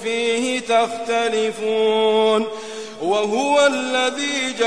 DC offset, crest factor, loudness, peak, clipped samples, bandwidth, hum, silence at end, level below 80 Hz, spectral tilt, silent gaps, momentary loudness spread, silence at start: 0.4%; 16 dB; -19 LUFS; -4 dBFS; under 0.1%; 11 kHz; none; 0 s; -64 dBFS; -2.5 dB/octave; none; 6 LU; 0 s